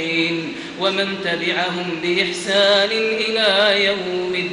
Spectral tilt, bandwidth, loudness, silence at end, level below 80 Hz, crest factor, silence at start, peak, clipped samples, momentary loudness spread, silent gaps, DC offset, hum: -3.5 dB/octave; 11 kHz; -18 LUFS; 0 s; -60 dBFS; 16 dB; 0 s; -2 dBFS; under 0.1%; 8 LU; none; under 0.1%; none